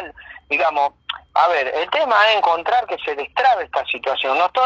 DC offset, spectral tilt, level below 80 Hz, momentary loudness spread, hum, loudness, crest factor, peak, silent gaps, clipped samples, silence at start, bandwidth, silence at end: under 0.1%; -2.5 dB/octave; -58 dBFS; 9 LU; none; -18 LUFS; 16 dB; -2 dBFS; none; under 0.1%; 0 s; 7.8 kHz; 0 s